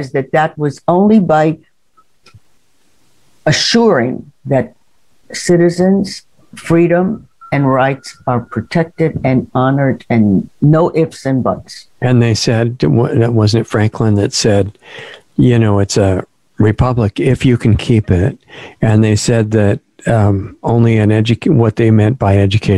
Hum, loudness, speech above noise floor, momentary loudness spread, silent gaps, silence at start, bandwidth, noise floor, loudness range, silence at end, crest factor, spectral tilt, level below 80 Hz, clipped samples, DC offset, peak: none; -13 LUFS; 46 dB; 9 LU; none; 0 s; 11.5 kHz; -58 dBFS; 3 LU; 0 s; 12 dB; -6.5 dB/octave; -40 dBFS; under 0.1%; under 0.1%; 0 dBFS